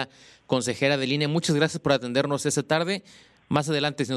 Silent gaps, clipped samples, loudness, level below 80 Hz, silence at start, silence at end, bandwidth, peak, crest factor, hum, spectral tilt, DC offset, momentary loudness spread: none; under 0.1%; -25 LUFS; -64 dBFS; 0 s; 0 s; 13.5 kHz; -8 dBFS; 18 dB; none; -4.5 dB/octave; under 0.1%; 5 LU